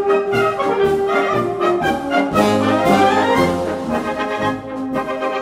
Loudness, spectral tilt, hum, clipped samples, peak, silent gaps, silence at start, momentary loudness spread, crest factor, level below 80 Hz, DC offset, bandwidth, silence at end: -17 LUFS; -5.5 dB/octave; none; under 0.1%; -2 dBFS; none; 0 s; 8 LU; 16 dB; -46 dBFS; under 0.1%; 16 kHz; 0 s